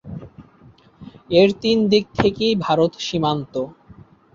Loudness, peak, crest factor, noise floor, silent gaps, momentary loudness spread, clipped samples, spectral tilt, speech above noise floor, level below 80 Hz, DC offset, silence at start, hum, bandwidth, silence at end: -19 LUFS; -2 dBFS; 18 dB; -50 dBFS; none; 13 LU; under 0.1%; -6 dB/octave; 32 dB; -48 dBFS; under 0.1%; 0.05 s; none; 7.6 kHz; 0.65 s